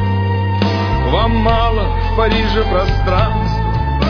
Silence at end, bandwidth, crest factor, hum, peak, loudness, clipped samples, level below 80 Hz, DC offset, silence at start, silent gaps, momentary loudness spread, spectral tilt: 0 s; 5.4 kHz; 12 dB; none; -2 dBFS; -15 LUFS; under 0.1%; -20 dBFS; under 0.1%; 0 s; none; 4 LU; -7.5 dB/octave